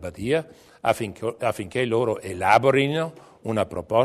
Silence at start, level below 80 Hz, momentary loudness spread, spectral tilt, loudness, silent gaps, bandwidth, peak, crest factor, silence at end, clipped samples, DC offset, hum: 0 s; -56 dBFS; 10 LU; -5.5 dB/octave; -24 LUFS; none; 13.5 kHz; -6 dBFS; 18 dB; 0 s; under 0.1%; under 0.1%; none